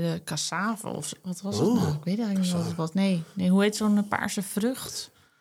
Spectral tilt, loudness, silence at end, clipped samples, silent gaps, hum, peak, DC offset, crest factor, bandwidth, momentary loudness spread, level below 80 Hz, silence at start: -5.5 dB/octave; -27 LUFS; 0.35 s; under 0.1%; none; none; -8 dBFS; under 0.1%; 18 dB; 16 kHz; 11 LU; -66 dBFS; 0 s